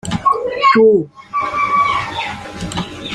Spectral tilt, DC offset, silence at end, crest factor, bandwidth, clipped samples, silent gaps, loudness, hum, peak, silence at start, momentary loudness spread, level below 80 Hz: -5 dB/octave; under 0.1%; 0 s; 14 dB; 11.5 kHz; under 0.1%; none; -15 LUFS; none; -2 dBFS; 0.05 s; 14 LU; -44 dBFS